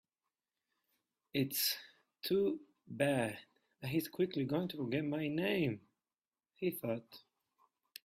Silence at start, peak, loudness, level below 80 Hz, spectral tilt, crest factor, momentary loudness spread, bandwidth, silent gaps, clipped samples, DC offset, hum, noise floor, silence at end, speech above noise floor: 1.35 s; -18 dBFS; -37 LUFS; -76 dBFS; -5 dB/octave; 20 dB; 12 LU; 16 kHz; 6.27-6.31 s; under 0.1%; under 0.1%; none; under -90 dBFS; 0.85 s; over 54 dB